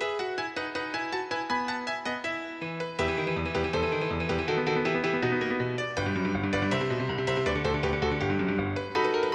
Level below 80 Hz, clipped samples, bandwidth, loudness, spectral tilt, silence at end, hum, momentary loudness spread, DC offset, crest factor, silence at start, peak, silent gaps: -48 dBFS; under 0.1%; 10 kHz; -29 LUFS; -6 dB/octave; 0 s; none; 5 LU; under 0.1%; 16 dB; 0 s; -14 dBFS; none